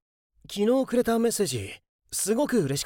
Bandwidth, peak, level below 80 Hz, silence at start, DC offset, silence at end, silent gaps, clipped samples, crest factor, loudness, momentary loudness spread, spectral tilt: 17 kHz; -12 dBFS; -58 dBFS; 0.5 s; under 0.1%; 0 s; 1.89-1.99 s; under 0.1%; 14 dB; -25 LUFS; 13 LU; -4.5 dB/octave